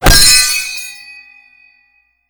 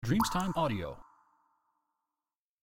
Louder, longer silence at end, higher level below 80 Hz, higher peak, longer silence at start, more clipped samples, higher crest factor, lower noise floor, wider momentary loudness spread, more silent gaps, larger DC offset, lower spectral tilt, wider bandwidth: first, -7 LUFS vs -32 LUFS; second, 1.35 s vs 1.6 s; first, -20 dBFS vs -52 dBFS; first, 0 dBFS vs -16 dBFS; about the same, 0 s vs 0 s; first, 0.8% vs under 0.1%; second, 14 dB vs 20 dB; second, -56 dBFS vs under -90 dBFS; first, 23 LU vs 15 LU; neither; neither; second, -1 dB/octave vs -5.5 dB/octave; first, over 20 kHz vs 16.5 kHz